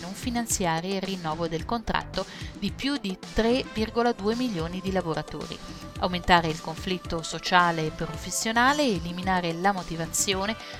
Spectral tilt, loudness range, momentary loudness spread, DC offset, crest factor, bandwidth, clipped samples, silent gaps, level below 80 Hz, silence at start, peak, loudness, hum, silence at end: -3.5 dB/octave; 4 LU; 11 LU; under 0.1%; 22 dB; 17.5 kHz; under 0.1%; none; -44 dBFS; 0 s; -4 dBFS; -27 LUFS; none; 0 s